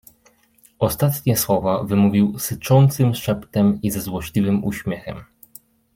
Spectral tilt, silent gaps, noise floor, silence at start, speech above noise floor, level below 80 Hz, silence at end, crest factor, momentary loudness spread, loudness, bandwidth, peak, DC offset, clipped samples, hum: -6.5 dB/octave; none; -57 dBFS; 0.8 s; 39 dB; -48 dBFS; 0.7 s; 16 dB; 11 LU; -20 LUFS; 16.5 kHz; -4 dBFS; under 0.1%; under 0.1%; none